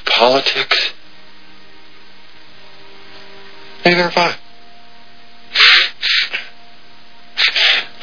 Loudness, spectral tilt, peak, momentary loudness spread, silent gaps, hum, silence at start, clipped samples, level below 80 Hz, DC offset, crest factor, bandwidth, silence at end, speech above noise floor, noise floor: -12 LUFS; -3 dB/octave; 0 dBFS; 15 LU; none; none; 0.05 s; under 0.1%; -58 dBFS; 3%; 18 dB; 5.4 kHz; 0.15 s; 31 dB; -45 dBFS